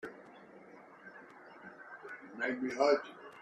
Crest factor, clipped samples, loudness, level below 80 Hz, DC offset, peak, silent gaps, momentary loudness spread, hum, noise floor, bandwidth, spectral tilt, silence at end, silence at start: 22 dB; under 0.1%; -33 LUFS; -82 dBFS; under 0.1%; -16 dBFS; none; 25 LU; none; -56 dBFS; 9 kHz; -4 dB/octave; 0 s; 0.05 s